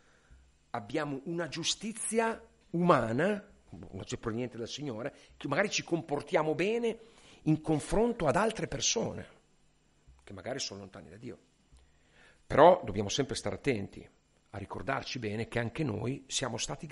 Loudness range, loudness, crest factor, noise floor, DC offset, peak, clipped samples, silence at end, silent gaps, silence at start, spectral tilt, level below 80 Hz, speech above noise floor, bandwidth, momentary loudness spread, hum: 6 LU; -32 LUFS; 24 dB; -67 dBFS; under 0.1%; -8 dBFS; under 0.1%; 0 s; none; 0.75 s; -4.5 dB/octave; -54 dBFS; 36 dB; 11.5 kHz; 19 LU; none